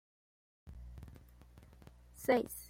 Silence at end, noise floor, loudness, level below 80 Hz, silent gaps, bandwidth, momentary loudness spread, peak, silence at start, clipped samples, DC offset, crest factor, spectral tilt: 0 s; -59 dBFS; -35 LUFS; -58 dBFS; none; 16.5 kHz; 27 LU; -18 dBFS; 0.65 s; under 0.1%; under 0.1%; 24 dB; -5 dB/octave